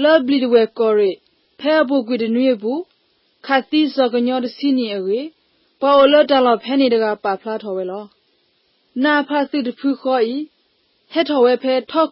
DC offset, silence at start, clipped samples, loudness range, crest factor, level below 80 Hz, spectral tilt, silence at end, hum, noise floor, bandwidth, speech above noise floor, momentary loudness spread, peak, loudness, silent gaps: under 0.1%; 0 s; under 0.1%; 5 LU; 16 dB; -70 dBFS; -9 dB/octave; 0.05 s; none; -62 dBFS; 5.8 kHz; 46 dB; 11 LU; -2 dBFS; -17 LUFS; none